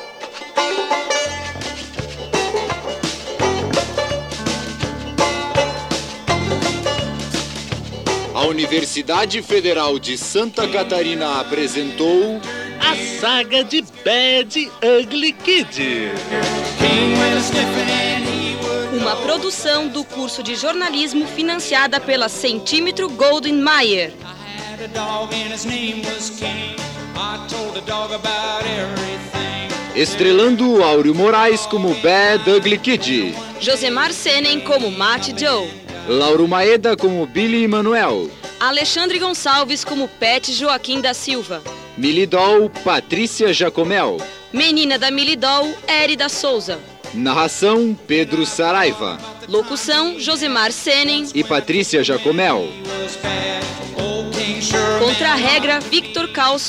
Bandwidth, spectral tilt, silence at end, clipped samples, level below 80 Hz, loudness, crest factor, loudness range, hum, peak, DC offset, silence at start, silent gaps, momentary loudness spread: 16 kHz; -3 dB/octave; 0 s; under 0.1%; -46 dBFS; -17 LUFS; 14 dB; 6 LU; none; -2 dBFS; under 0.1%; 0 s; none; 11 LU